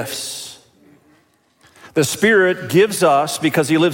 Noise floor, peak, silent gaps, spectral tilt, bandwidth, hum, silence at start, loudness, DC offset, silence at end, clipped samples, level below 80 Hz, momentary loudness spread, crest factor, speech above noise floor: -57 dBFS; -2 dBFS; none; -4 dB/octave; 17 kHz; none; 0 s; -16 LUFS; under 0.1%; 0 s; under 0.1%; -62 dBFS; 13 LU; 16 dB; 42 dB